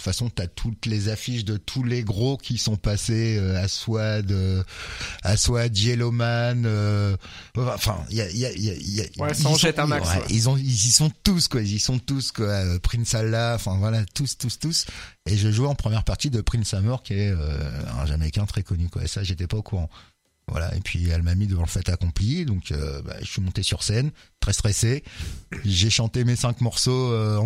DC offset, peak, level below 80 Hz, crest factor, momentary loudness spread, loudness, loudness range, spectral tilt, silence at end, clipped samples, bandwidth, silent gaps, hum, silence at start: under 0.1%; -2 dBFS; -36 dBFS; 22 dB; 9 LU; -24 LUFS; 6 LU; -4.5 dB/octave; 0 s; under 0.1%; 16 kHz; none; none; 0 s